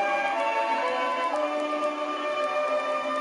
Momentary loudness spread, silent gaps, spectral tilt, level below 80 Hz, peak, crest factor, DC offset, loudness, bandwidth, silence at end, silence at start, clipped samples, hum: 3 LU; none; -2 dB/octave; -82 dBFS; -14 dBFS; 12 dB; under 0.1%; -27 LUFS; 11 kHz; 0 s; 0 s; under 0.1%; none